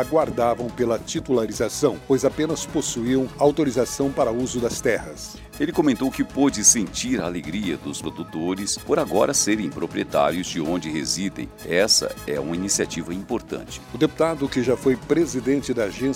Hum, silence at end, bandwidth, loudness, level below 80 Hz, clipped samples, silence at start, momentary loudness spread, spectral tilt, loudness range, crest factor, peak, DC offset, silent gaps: none; 0 s; 16.5 kHz; -22 LUFS; -48 dBFS; under 0.1%; 0 s; 10 LU; -3.5 dB/octave; 2 LU; 20 dB; -2 dBFS; under 0.1%; none